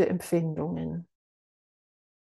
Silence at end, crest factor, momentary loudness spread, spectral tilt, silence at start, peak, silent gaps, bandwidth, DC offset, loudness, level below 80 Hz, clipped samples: 1.2 s; 20 dB; 10 LU; -7.5 dB/octave; 0 s; -12 dBFS; none; 12.5 kHz; under 0.1%; -30 LUFS; -64 dBFS; under 0.1%